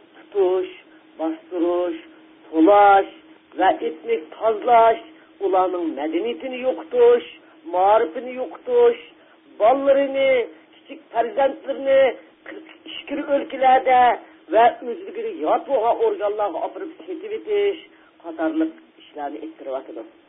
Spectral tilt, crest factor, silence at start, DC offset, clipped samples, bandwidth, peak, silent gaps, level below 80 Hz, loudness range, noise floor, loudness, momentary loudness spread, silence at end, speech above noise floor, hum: -8.5 dB/octave; 16 dB; 0.35 s; under 0.1%; under 0.1%; 3.9 kHz; -4 dBFS; none; -62 dBFS; 5 LU; -47 dBFS; -20 LUFS; 18 LU; 0.2 s; 27 dB; none